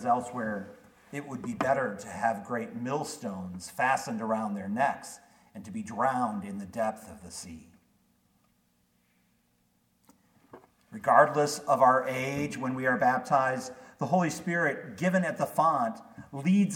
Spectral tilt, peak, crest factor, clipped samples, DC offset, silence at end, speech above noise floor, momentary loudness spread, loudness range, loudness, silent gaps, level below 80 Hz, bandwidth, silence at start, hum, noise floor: -5.5 dB/octave; -6 dBFS; 24 dB; under 0.1%; under 0.1%; 0 s; 42 dB; 18 LU; 9 LU; -29 LUFS; none; -70 dBFS; 17.5 kHz; 0 s; 60 Hz at -60 dBFS; -71 dBFS